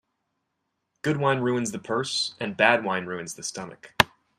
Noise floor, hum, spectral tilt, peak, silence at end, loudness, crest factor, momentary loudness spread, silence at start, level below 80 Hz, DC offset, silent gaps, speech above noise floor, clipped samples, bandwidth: -79 dBFS; none; -3.5 dB/octave; -2 dBFS; 0.35 s; -25 LUFS; 26 dB; 13 LU; 1.05 s; -60 dBFS; under 0.1%; none; 53 dB; under 0.1%; 15 kHz